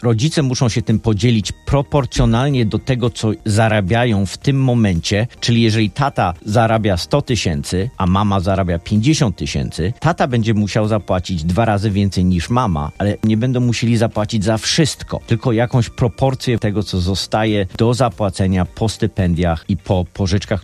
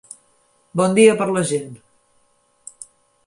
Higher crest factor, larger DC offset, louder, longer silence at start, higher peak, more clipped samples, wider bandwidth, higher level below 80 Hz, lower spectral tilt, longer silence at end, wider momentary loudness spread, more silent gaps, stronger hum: second, 14 dB vs 20 dB; neither; about the same, -17 LUFS vs -17 LUFS; second, 0 s vs 0.75 s; about the same, -2 dBFS vs -2 dBFS; neither; first, 13 kHz vs 11.5 kHz; first, -36 dBFS vs -64 dBFS; about the same, -6 dB/octave vs -5 dB/octave; second, 0.05 s vs 1.5 s; second, 4 LU vs 26 LU; neither; neither